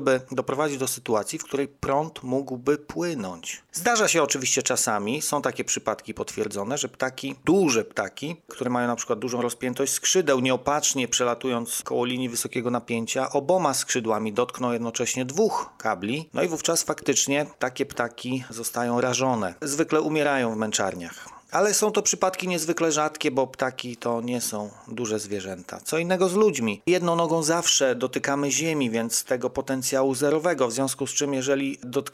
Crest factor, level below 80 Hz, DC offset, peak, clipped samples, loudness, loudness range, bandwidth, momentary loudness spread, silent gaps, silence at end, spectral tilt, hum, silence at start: 20 dB; -62 dBFS; under 0.1%; -6 dBFS; under 0.1%; -25 LUFS; 3 LU; 16 kHz; 9 LU; none; 0.05 s; -3 dB/octave; none; 0 s